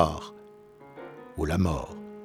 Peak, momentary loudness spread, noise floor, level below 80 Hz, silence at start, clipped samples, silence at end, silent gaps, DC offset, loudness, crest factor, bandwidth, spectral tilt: -6 dBFS; 23 LU; -51 dBFS; -42 dBFS; 0 s; under 0.1%; 0 s; none; under 0.1%; -30 LUFS; 26 dB; 14.5 kHz; -7 dB/octave